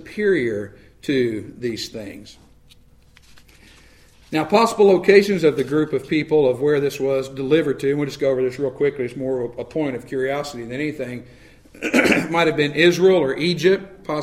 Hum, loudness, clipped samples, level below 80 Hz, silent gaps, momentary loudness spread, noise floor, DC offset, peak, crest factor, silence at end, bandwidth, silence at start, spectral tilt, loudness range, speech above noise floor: none; -19 LUFS; under 0.1%; -52 dBFS; none; 14 LU; -51 dBFS; 0.1%; 0 dBFS; 20 dB; 0 s; 15 kHz; 0 s; -5.5 dB/octave; 10 LU; 32 dB